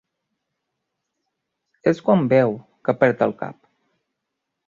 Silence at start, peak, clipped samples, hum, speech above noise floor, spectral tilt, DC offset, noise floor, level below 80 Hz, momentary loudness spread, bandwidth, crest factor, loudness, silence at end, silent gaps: 1.85 s; -2 dBFS; under 0.1%; none; 61 dB; -8.5 dB/octave; under 0.1%; -80 dBFS; -64 dBFS; 12 LU; 7.2 kHz; 22 dB; -20 LUFS; 1.15 s; none